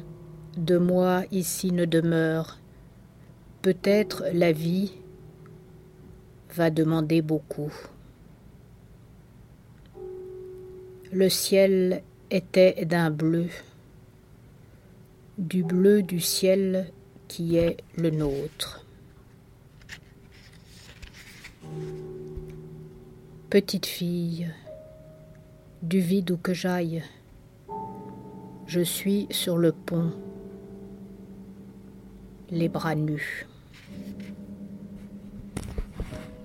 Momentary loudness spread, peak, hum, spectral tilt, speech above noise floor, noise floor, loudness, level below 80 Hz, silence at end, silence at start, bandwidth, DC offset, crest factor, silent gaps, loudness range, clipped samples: 23 LU; -8 dBFS; none; -5.5 dB/octave; 28 dB; -52 dBFS; -26 LUFS; -52 dBFS; 0 s; 0 s; 16.5 kHz; under 0.1%; 20 dB; none; 14 LU; under 0.1%